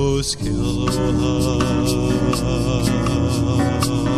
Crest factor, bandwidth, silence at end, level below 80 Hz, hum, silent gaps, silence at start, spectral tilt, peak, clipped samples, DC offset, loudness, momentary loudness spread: 14 dB; 14.5 kHz; 0 s; -30 dBFS; none; none; 0 s; -6 dB/octave; -4 dBFS; under 0.1%; under 0.1%; -19 LUFS; 2 LU